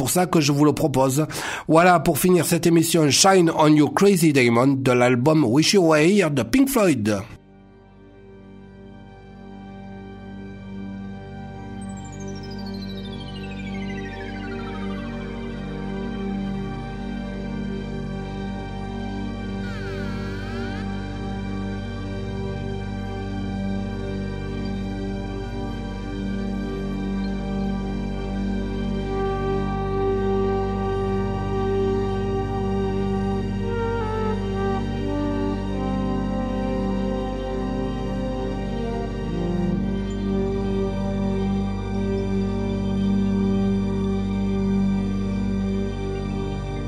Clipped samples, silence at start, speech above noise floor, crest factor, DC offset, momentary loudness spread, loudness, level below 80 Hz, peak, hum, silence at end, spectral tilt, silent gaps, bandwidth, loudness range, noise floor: under 0.1%; 0 s; 31 dB; 20 dB; under 0.1%; 15 LU; -23 LUFS; -34 dBFS; -2 dBFS; 50 Hz at -55 dBFS; 0 s; -5.5 dB/octave; none; 16 kHz; 15 LU; -48 dBFS